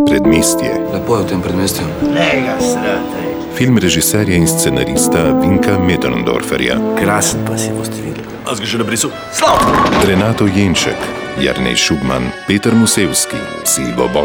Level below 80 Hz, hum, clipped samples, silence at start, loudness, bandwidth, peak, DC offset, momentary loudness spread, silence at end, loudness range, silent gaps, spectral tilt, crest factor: -34 dBFS; none; under 0.1%; 0 s; -13 LUFS; over 20 kHz; 0 dBFS; under 0.1%; 7 LU; 0 s; 3 LU; none; -4 dB/octave; 12 dB